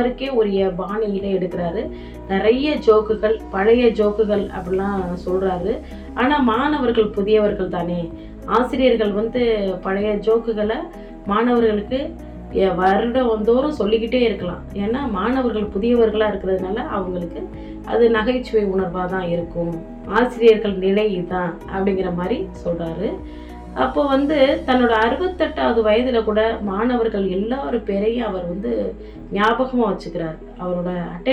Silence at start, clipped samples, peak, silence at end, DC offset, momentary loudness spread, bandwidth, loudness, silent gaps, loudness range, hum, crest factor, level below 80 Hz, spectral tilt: 0 s; under 0.1%; -2 dBFS; 0 s; under 0.1%; 11 LU; 8.4 kHz; -19 LUFS; none; 3 LU; none; 16 dB; -38 dBFS; -7.5 dB/octave